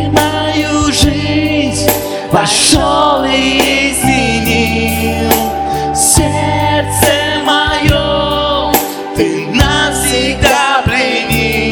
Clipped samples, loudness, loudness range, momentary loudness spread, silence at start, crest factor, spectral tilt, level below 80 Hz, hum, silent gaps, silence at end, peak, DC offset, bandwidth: 0.4%; -11 LUFS; 1 LU; 5 LU; 0 s; 12 dB; -3.5 dB/octave; -26 dBFS; none; none; 0 s; 0 dBFS; under 0.1%; over 20 kHz